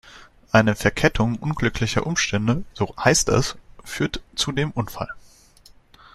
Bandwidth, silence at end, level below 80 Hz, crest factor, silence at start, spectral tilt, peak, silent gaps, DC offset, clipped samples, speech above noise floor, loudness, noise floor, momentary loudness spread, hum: 14.5 kHz; 0.95 s; -40 dBFS; 22 dB; 0.05 s; -4.5 dB/octave; -2 dBFS; none; under 0.1%; under 0.1%; 30 dB; -22 LUFS; -51 dBFS; 12 LU; none